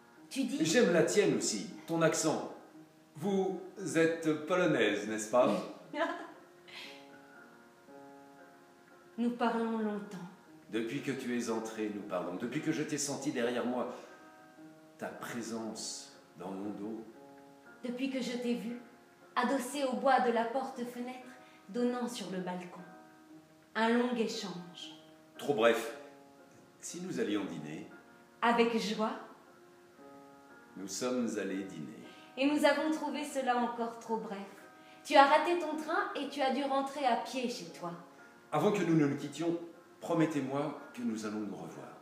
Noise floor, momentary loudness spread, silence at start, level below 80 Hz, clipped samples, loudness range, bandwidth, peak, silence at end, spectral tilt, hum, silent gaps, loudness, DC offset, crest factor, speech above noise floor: -59 dBFS; 19 LU; 0.2 s; -88 dBFS; under 0.1%; 9 LU; 15.5 kHz; -8 dBFS; 0 s; -4.5 dB/octave; none; none; -34 LUFS; under 0.1%; 28 dB; 26 dB